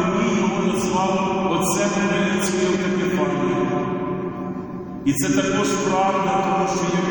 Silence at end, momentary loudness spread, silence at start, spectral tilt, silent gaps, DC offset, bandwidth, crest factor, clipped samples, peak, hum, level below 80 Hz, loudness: 0 s; 6 LU; 0 s; -5 dB/octave; none; under 0.1%; over 20 kHz; 14 dB; under 0.1%; -6 dBFS; none; -50 dBFS; -21 LUFS